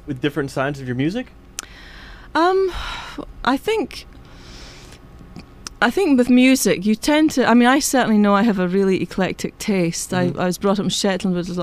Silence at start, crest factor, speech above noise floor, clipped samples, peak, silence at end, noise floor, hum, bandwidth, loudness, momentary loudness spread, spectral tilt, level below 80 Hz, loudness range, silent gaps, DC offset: 0.05 s; 18 dB; 23 dB; under 0.1%; 0 dBFS; 0 s; -41 dBFS; none; 15.5 kHz; -18 LUFS; 19 LU; -4.5 dB/octave; -44 dBFS; 8 LU; none; under 0.1%